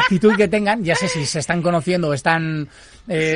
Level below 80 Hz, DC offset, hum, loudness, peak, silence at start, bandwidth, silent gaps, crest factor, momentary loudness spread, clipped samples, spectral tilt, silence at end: -48 dBFS; under 0.1%; none; -18 LUFS; -2 dBFS; 0 s; 11 kHz; none; 16 dB; 10 LU; under 0.1%; -5 dB/octave; 0 s